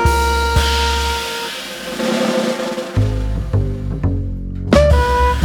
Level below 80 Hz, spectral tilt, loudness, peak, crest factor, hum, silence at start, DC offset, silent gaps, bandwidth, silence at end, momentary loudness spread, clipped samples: -22 dBFS; -5 dB/octave; -17 LUFS; 0 dBFS; 16 dB; none; 0 s; under 0.1%; none; 19 kHz; 0 s; 10 LU; under 0.1%